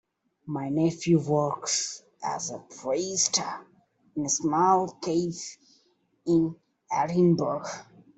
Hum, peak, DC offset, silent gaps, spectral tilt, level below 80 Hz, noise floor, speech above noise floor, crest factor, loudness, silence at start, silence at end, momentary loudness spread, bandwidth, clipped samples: none; -8 dBFS; under 0.1%; none; -4.5 dB/octave; -68 dBFS; -68 dBFS; 42 dB; 20 dB; -27 LUFS; 0.45 s; 0.35 s; 14 LU; 8.4 kHz; under 0.1%